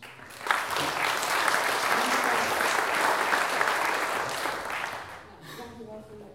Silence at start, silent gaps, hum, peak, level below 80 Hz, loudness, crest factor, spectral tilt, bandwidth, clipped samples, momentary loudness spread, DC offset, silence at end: 0 s; none; none; -4 dBFS; -64 dBFS; -26 LUFS; 24 dB; -1.5 dB/octave; 17 kHz; under 0.1%; 18 LU; under 0.1%; 0 s